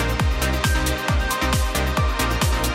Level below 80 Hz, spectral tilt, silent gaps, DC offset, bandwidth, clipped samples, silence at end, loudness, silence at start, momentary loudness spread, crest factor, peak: -24 dBFS; -4 dB/octave; none; under 0.1%; 17 kHz; under 0.1%; 0 s; -21 LUFS; 0 s; 1 LU; 14 dB; -6 dBFS